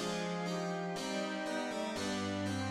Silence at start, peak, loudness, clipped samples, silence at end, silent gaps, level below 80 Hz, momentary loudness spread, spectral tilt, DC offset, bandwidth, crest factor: 0 s; -24 dBFS; -37 LUFS; under 0.1%; 0 s; none; -70 dBFS; 1 LU; -4.5 dB/octave; under 0.1%; 14.5 kHz; 12 dB